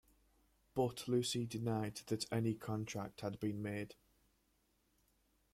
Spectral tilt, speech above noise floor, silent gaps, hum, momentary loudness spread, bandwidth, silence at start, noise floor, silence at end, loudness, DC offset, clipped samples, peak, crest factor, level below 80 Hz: -5.5 dB/octave; 38 dB; none; none; 8 LU; 16 kHz; 0.75 s; -78 dBFS; 1.6 s; -41 LUFS; under 0.1%; under 0.1%; -24 dBFS; 18 dB; -72 dBFS